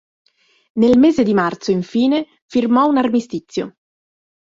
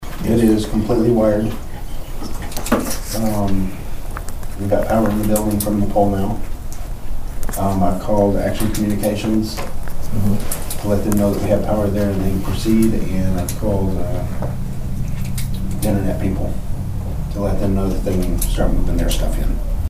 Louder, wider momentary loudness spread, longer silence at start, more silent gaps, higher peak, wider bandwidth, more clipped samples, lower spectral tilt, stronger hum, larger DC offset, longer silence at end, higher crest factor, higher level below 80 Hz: first, -16 LUFS vs -20 LUFS; about the same, 14 LU vs 14 LU; first, 0.75 s vs 0 s; first, 2.42-2.49 s vs none; second, -4 dBFS vs 0 dBFS; second, 7.6 kHz vs 16 kHz; neither; about the same, -6.5 dB/octave vs -6.5 dB/octave; neither; neither; first, 0.7 s vs 0 s; about the same, 14 dB vs 16 dB; second, -54 dBFS vs -24 dBFS